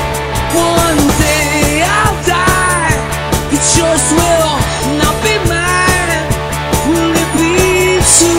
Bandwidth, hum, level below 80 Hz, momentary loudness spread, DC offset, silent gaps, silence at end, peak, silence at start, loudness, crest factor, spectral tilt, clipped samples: 16.5 kHz; none; -24 dBFS; 5 LU; 0.3%; none; 0 s; 0 dBFS; 0 s; -11 LUFS; 12 dB; -3.5 dB/octave; under 0.1%